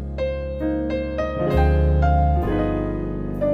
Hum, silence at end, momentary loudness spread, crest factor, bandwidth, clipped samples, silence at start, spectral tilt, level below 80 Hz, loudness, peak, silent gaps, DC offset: none; 0 s; 8 LU; 14 dB; 5.2 kHz; under 0.1%; 0 s; -9.5 dB/octave; -24 dBFS; -22 LUFS; -6 dBFS; none; under 0.1%